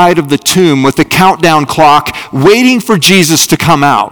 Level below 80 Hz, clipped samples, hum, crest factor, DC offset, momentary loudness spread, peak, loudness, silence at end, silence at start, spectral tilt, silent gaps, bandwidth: -40 dBFS; 7%; none; 8 dB; under 0.1%; 4 LU; 0 dBFS; -7 LUFS; 0 s; 0 s; -4 dB/octave; none; over 20 kHz